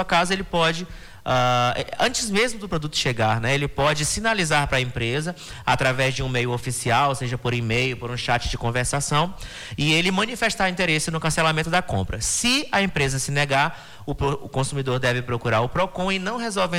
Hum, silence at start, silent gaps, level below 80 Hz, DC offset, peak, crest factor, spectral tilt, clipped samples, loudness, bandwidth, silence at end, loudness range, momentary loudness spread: none; 0 s; none; -40 dBFS; under 0.1%; -8 dBFS; 14 dB; -4 dB/octave; under 0.1%; -22 LUFS; 19 kHz; 0 s; 2 LU; 6 LU